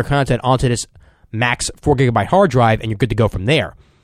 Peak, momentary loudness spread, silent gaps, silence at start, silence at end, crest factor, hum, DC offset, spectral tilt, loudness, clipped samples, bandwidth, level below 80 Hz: -2 dBFS; 8 LU; none; 0 s; 0.35 s; 14 dB; none; under 0.1%; -5.5 dB/octave; -16 LUFS; under 0.1%; 13 kHz; -34 dBFS